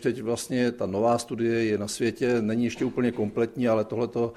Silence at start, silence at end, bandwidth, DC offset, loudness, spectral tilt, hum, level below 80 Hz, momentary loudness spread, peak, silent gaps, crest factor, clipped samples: 0 s; 0 s; 14 kHz; under 0.1%; -26 LUFS; -5.5 dB/octave; none; -60 dBFS; 3 LU; -12 dBFS; none; 14 dB; under 0.1%